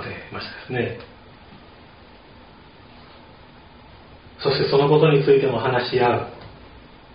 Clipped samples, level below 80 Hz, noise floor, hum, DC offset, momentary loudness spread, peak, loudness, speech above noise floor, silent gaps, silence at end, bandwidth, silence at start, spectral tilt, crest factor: under 0.1%; -52 dBFS; -46 dBFS; none; under 0.1%; 19 LU; -4 dBFS; -20 LUFS; 28 dB; none; 0.35 s; 5.2 kHz; 0 s; -5 dB/octave; 20 dB